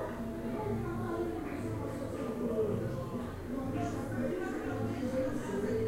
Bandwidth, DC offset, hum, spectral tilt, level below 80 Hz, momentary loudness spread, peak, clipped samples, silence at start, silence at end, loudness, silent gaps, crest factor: 16 kHz; under 0.1%; none; -7.5 dB/octave; -50 dBFS; 5 LU; -22 dBFS; under 0.1%; 0 s; 0 s; -36 LUFS; none; 14 dB